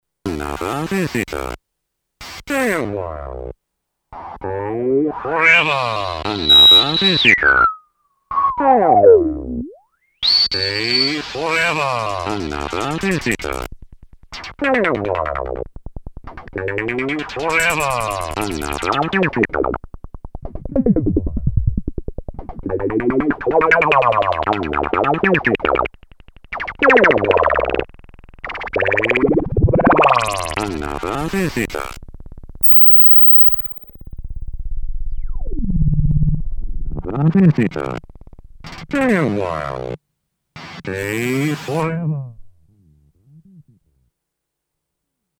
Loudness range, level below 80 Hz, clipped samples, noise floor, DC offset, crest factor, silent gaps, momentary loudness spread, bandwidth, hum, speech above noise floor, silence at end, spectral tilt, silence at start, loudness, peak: 14 LU; -30 dBFS; under 0.1%; -79 dBFS; under 0.1%; 18 dB; none; 21 LU; over 20 kHz; none; 62 dB; 1.8 s; -5 dB/octave; 0.25 s; -15 LUFS; 0 dBFS